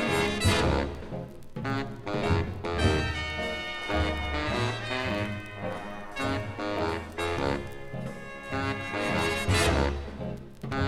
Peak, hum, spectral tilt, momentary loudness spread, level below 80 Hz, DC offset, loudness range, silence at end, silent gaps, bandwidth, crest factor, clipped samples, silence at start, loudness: -10 dBFS; none; -5 dB/octave; 13 LU; -40 dBFS; under 0.1%; 4 LU; 0 s; none; 14.5 kHz; 18 dB; under 0.1%; 0 s; -30 LUFS